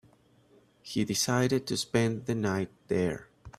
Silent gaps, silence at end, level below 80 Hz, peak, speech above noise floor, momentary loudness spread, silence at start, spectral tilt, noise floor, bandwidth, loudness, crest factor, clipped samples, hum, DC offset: none; 0.1 s; -62 dBFS; -10 dBFS; 33 dB; 8 LU; 0.85 s; -4.5 dB/octave; -62 dBFS; 16 kHz; -30 LUFS; 20 dB; under 0.1%; none; under 0.1%